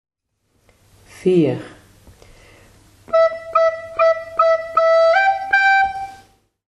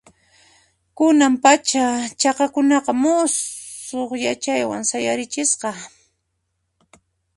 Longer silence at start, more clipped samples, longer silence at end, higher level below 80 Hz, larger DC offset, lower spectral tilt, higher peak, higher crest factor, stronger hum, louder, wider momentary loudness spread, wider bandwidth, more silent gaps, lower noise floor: first, 1.2 s vs 1 s; neither; second, 0.55 s vs 1.5 s; first, -54 dBFS vs -64 dBFS; neither; first, -6 dB/octave vs -2 dB/octave; about the same, -2 dBFS vs 0 dBFS; about the same, 16 dB vs 20 dB; neither; first, -16 LUFS vs -19 LUFS; second, 9 LU vs 13 LU; about the same, 11.5 kHz vs 11.5 kHz; neither; second, -66 dBFS vs -73 dBFS